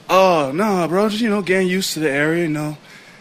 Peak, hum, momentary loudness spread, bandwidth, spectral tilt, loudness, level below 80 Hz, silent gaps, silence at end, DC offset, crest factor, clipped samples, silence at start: -2 dBFS; none; 9 LU; 16 kHz; -5 dB/octave; -18 LUFS; -58 dBFS; none; 0.1 s; under 0.1%; 16 dB; under 0.1%; 0.1 s